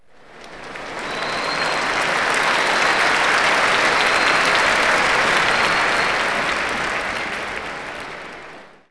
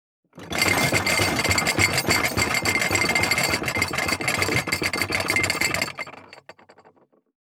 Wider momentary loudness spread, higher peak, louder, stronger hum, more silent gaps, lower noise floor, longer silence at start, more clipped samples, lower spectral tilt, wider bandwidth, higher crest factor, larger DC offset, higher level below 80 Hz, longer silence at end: first, 15 LU vs 4 LU; about the same, -4 dBFS vs -4 dBFS; first, -17 LUFS vs -21 LUFS; neither; neither; second, -43 dBFS vs -57 dBFS; second, 0.15 s vs 0.35 s; neither; about the same, -1.5 dB/octave vs -2.5 dB/octave; second, 11 kHz vs over 20 kHz; about the same, 16 dB vs 20 dB; neither; about the same, -48 dBFS vs -48 dBFS; second, 0.2 s vs 1.2 s